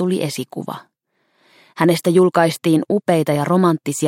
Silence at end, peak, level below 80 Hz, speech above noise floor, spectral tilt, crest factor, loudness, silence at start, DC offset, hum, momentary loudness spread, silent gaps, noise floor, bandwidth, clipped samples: 0 s; -2 dBFS; -64 dBFS; 49 dB; -6 dB/octave; 16 dB; -17 LUFS; 0 s; under 0.1%; none; 14 LU; none; -66 dBFS; 16.5 kHz; under 0.1%